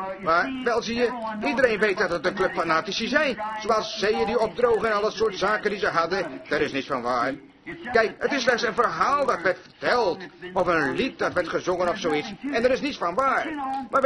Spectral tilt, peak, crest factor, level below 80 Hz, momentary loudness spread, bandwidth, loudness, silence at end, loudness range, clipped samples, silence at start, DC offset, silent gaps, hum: -4 dB/octave; -6 dBFS; 18 dB; -54 dBFS; 6 LU; 11 kHz; -24 LUFS; 0 s; 2 LU; under 0.1%; 0 s; under 0.1%; none; none